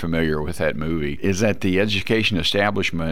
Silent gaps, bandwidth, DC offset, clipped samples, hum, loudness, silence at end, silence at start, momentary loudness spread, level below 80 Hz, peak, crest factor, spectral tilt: none; 16.5 kHz; 3%; under 0.1%; none; -21 LUFS; 0 s; 0 s; 5 LU; -40 dBFS; -6 dBFS; 16 dB; -5 dB/octave